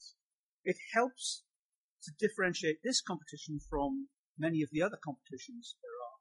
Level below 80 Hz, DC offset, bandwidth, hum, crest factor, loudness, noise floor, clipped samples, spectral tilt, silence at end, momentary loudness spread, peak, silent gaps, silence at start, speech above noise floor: -60 dBFS; under 0.1%; 11.5 kHz; none; 22 dB; -36 LUFS; under -90 dBFS; under 0.1%; -3.5 dB/octave; 0.05 s; 15 LU; -16 dBFS; 0.21-0.64 s, 1.56-1.97 s, 4.18-4.35 s; 0 s; over 54 dB